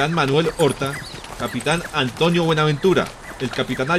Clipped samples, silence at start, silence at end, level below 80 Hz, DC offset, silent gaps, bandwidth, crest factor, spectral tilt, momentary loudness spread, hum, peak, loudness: under 0.1%; 0 s; 0 s; -44 dBFS; under 0.1%; none; 15.5 kHz; 14 dB; -5 dB/octave; 11 LU; none; -6 dBFS; -20 LUFS